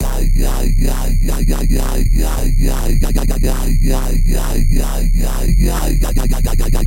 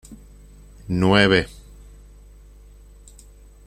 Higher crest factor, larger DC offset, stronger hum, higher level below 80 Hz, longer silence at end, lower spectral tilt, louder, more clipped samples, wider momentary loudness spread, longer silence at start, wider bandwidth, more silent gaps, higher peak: second, 12 dB vs 22 dB; neither; second, none vs 50 Hz at -40 dBFS; first, -12 dBFS vs -44 dBFS; second, 0 s vs 2.2 s; about the same, -5.5 dB/octave vs -6 dB/octave; about the same, -18 LUFS vs -18 LUFS; neither; second, 2 LU vs 21 LU; about the same, 0 s vs 0.1 s; first, 16.5 kHz vs 14 kHz; neither; about the same, 0 dBFS vs -2 dBFS